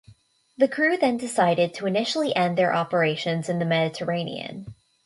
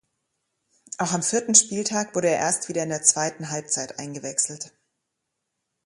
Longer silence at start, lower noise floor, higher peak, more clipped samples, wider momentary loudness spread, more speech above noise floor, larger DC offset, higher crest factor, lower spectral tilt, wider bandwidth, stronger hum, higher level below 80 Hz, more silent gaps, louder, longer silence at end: second, 0.1 s vs 0.9 s; second, -55 dBFS vs -80 dBFS; second, -6 dBFS vs -2 dBFS; neither; second, 7 LU vs 16 LU; second, 31 dB vs 56 dB; neither; second, 18 dB vs 24 dB; first, -5.5 dB/octave vs -2.5 dB/octave; about the same, 11.5 kHz vs 11.5 kHz; neither; about the same, -66 dBFS vs -70 dBFS; neither; about the same, -23 LUFS vs -22 LUFS; second, 0.35 s vs 1.2 s